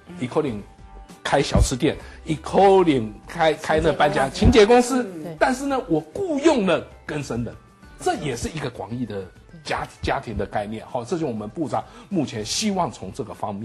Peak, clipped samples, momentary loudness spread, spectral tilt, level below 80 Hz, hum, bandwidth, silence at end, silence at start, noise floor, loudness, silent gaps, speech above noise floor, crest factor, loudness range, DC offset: -4 dBFS; under 0.1%; 15 LU; -5 dB/octave; -36 dBFS; none; 12.5 kHz; 0 s; 0.1 s; -43 dBFS; -22 LUFS; none; 21 dB; 18 dB; 10 LU; under 0.1%